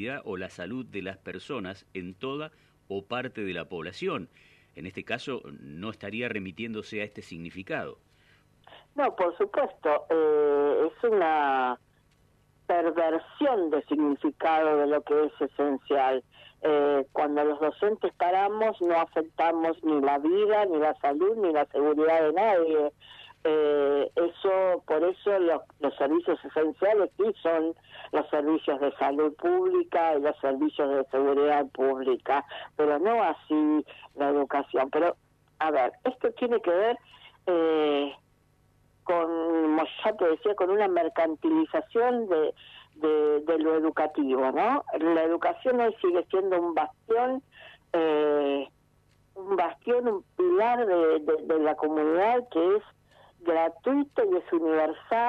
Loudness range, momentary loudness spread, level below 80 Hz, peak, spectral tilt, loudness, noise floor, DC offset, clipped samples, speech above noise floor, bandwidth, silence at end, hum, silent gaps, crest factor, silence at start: 10 LU; 12 LU; -70 dBFS; -14 dBFS; -7 dB/octave; -27 LUFS; -65 dBFS; under 0.1%; under 0.1%; 39 dB; 7.2 kHz; 0 s; 50 Hz at -65 dBFS; none; 14 dB; 0 s